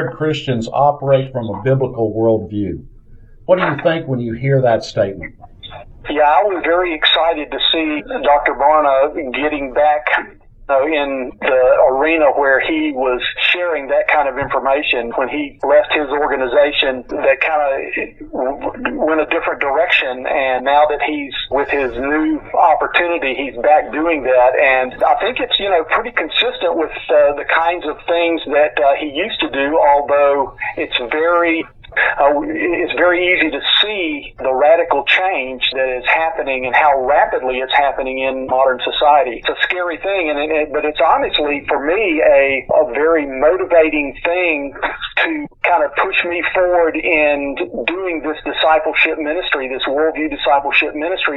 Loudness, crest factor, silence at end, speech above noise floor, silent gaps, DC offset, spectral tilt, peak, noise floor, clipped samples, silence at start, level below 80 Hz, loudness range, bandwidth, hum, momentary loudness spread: -15 LUFS; 14 dB; 0 s; 25 dB; none; under 0.1%; -6 dB/octave; 0 dBFS; -40 dBFS; under 0.1%; 0 s; -42 dBFS; 3 LU; 7.6 kHz; none; 7 LU